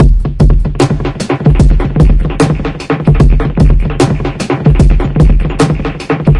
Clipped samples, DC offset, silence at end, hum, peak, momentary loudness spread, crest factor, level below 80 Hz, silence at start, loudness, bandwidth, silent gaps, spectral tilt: 0.1%; under 0.1%; 0 s; none; 0 dBFS; 7 LU; 8 dB; -12 dBFS; 0 s; -11 LUFS; 11 kHz; none; -7.5 dB/octave